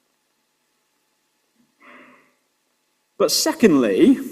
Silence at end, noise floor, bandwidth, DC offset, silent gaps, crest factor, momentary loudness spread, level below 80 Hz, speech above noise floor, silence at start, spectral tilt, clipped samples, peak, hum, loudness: 0 s; -69 dBFS; 16 kHz; under 0.1%; none; 22 dB; 4 LU; -62 dBFS; 53 dB; 3.2 s; -4 dB/octave; under 0.1%; 0 dBFS; none; -17 LUFS